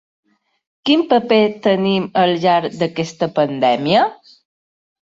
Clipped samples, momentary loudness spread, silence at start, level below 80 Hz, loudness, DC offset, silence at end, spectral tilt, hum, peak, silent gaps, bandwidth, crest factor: under 0.1%; 7 LU; 0.85 s; -60 dBFS; -16 LUFS; under 0.1%; 1 s; -6 dB/octave; none; -2 dBFS; none; 7.8 kHz; 16 dB